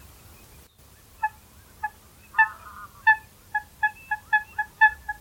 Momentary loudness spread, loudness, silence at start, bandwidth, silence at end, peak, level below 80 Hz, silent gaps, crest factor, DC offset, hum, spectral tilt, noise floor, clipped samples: 16 LU; -25 LUFS; 1.2 s; 19 kHz; 0.05 s; -6 dBFS; -56 dBFS; none; 20 dB; under 0.1%; none; -1.5 dB/octave; -53 dBFS; under 0.1%